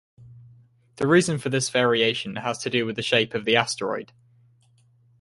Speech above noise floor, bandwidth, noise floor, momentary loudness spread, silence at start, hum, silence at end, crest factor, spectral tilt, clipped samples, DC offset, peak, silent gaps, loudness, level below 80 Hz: 37 dB; 11.5 kHz; -60 dBFS; 9 LU; 0.2 s; none; 1.15 s; 22 dB; -4 dB/octave; under 0.1%; under 0.1%; -2 dBFS; none; -23 LUFS; -64 dBFS